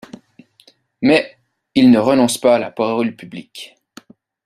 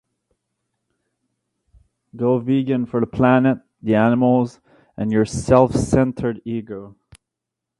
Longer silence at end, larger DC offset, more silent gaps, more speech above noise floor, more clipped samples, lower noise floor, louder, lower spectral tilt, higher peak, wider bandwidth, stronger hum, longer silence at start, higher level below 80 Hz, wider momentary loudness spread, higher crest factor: about the same, 0.8 s vs 0.9 s; neither; neither; second, 39 dB vs 65 dB; neither; second, -53 dBFS vs -83 dBFS; first, -15 LUFS vs -19 LUFS; second, -5 dB/octave vs -7.5 dB/octave; about the same, -2 dBFS vs 0 dBFS; first, 14 kHz vs 11.5 kHz; neither; second, 1 s vs 2.15 s; second, -58 dBFS vs -44 dBFS; first, 22 LU vs 12 LU; about the same, 16 dB vs 20 dB